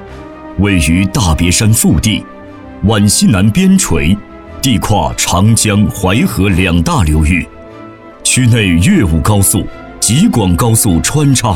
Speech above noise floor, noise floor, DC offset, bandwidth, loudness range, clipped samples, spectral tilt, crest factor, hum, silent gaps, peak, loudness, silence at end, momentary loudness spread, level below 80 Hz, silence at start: 22 dB; -32 dBFS; under 0.1%; 17 kHz; 2 LU; under 0.1%; -4.5 dB/octave; 10 dB; none; none; 0 dBFS; -10 LUFS; 0 s; 7 LU; -24 dBFS; 0 s